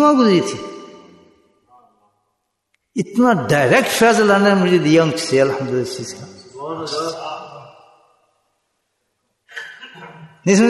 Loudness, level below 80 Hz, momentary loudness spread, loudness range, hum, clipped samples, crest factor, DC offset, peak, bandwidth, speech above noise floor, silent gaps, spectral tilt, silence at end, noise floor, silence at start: -16 LUFS; -60 dBFS; 23 LU; 16 LU; none; under 0.1%; 16 dB; under 0.1%; -2 dBFS; 12.5 kHz; 57 dB; none; -5 dB/octave; 0 s; -72 dBFS; 0 s